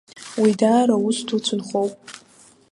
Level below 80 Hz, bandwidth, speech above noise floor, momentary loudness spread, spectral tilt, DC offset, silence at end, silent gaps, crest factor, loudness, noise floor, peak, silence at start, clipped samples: -70 dBFS; 11.5 kHz; 33 dB; 16 LU; -5 dB/octave; under 0.1%; 0.55 s; none; 16 dB; -20 LUFS; -52 dBFS; -4 dBFS; 0.15 s; under 0.1%